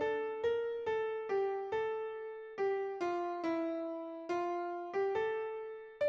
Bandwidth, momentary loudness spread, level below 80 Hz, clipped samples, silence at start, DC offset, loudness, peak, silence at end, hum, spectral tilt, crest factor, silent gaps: 7.2 kHz; 7 LU; -76 dBFS; under 0.1%; 0 s; under 0.1%; -37 LUFS; -24 dBFS; 0 s; none; -5.5 dB/octave; 12 dB; none